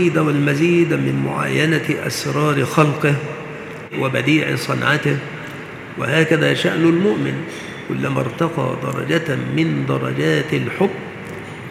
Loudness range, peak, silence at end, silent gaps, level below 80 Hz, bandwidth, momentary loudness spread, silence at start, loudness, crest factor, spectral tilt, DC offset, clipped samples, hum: 3 LU; 0 dBFS; 0 s; none; -56 dBFS; 15 kHz; 14 LU; 0 s; -18 LUFS; 18 dB; -6 dB/octave; under 0.1%; under 0.1%; none